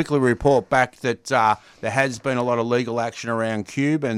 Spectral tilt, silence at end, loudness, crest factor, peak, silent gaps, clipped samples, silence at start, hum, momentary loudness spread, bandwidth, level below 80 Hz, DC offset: -5.5 dB/octave; 0 s; -21 LUFS; 16 dB; -4 dBFS; none; under 0.1%; 0 s; none; 7 LU; 14.5 kHz; -48 dBFS; under 0.1%